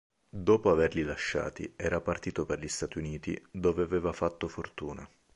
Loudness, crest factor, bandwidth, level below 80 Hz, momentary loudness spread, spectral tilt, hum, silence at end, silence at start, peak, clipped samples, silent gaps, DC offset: -32 LUFS; 20 dB; 11 kHz; -50 dBFS; 13 LU; -5.5 dB/octave; none; 0.3 s; 0.35 s; -12 dBFS; under 0.1%; none; under 0.1%